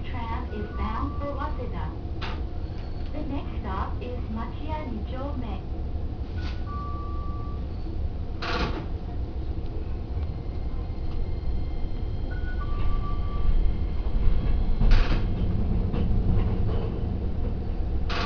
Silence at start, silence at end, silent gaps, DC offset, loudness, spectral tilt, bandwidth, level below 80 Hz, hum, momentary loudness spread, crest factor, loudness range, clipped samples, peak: 0 s; 0 s; none; under 0.1%; -31 LUFS; -8 dB/octave; 5.4 kHz; -28 dBFS; none; 7 LU; 20 dB; 6 LU; under 0.1%; -6 dBFS